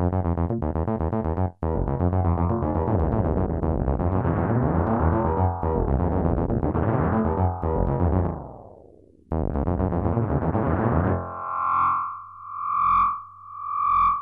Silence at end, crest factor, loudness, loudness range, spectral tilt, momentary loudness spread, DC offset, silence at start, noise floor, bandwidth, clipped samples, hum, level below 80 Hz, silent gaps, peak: 0 s; 18 dB; -24 LUFS; 2 LU; -12.5 dB/octave; 7 LU; under 0.1%; 0 s; -52 dBFS; 3.8 kHz; under 0.1%; 50 Hz at -50 dBFS; -32 dBFS; none; -6 dBFS